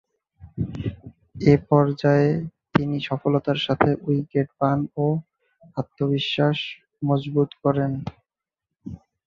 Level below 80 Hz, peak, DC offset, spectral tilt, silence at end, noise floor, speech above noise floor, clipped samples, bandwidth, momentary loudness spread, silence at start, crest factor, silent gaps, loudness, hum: -50 dBFS; -2 dBFS; under 0.1%; -8 dB/octave; 0.3 s; -86 dBFS; 64 dB; under 0.1%; 7 kHz; 14 LU; 0.4 s; 20 dB; none; -23 LUFS; none